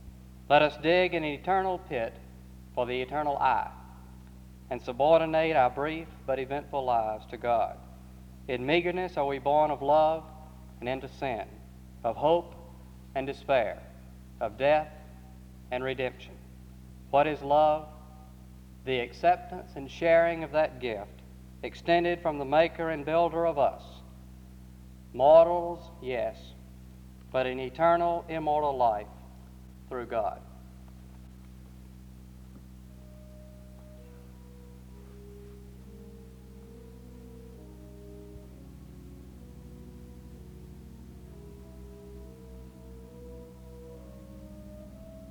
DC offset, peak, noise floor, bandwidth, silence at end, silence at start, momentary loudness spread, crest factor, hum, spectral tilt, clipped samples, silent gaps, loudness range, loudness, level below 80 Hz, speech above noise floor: under 0.1%; -8 dBFS; -49 dBFS; 19 kHz; 0 s; 0 s; 26 LU; 22 dB; none; -6.5 dB/octave; under 0.1%; none; 22 LU; -28 LUFS; -50 dBFS; 22 dB